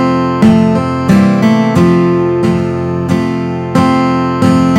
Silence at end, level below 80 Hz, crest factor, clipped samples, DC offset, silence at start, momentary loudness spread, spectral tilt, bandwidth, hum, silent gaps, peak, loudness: 0 s; -38 dBFS; 10 dB; 0.3%; under 0.1%; 0 s; 6 LU; -7.5 dB/octave; 13 kHz; none; none; 0 dBFS; -11 LUFS